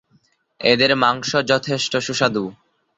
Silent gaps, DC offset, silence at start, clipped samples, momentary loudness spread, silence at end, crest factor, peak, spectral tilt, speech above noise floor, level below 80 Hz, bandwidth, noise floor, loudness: none; under 0.1%; 0.6 s; under 0.1%; 7 LU; 0.45 s; 20 dB; 0 dBFS; -3.5 dB/octave; 42 dB; -58 dBFS; 8.2 kHz; -61 dBFS; -18 LUFS